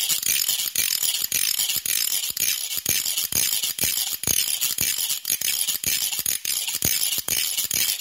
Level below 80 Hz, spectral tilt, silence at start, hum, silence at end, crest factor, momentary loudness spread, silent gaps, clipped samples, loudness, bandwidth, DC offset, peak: -54 dBFS; 1 dB/octave; 0 s; none; 0 s; 24 dB; 2 LU; none; under 0.1%; -21 LUFS; 16.5 kHz; under 0.1%; 0 dBFS